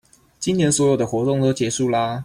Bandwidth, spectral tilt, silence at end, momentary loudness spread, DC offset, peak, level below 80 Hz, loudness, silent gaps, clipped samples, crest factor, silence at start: 15 kHz; -5 dB/octave; 0 s; 5 LU; under 0.1%; -8 dBFS; -54 dBFS; -20 LUFS; none; under 0.1%; 12 dB; 0.4 s